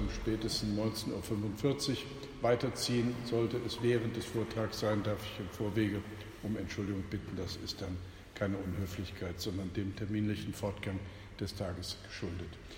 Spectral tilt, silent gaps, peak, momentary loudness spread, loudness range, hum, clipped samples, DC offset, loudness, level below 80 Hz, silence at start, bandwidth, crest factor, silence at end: -5.5 dB/octave; none; -16 dBFS; 9 LU; 5 LU; none; under 0.1%; under 0.1%; -37 LUFS; -52 dBFS; 0 s; 16.5 kHz; 20 dB; 0 s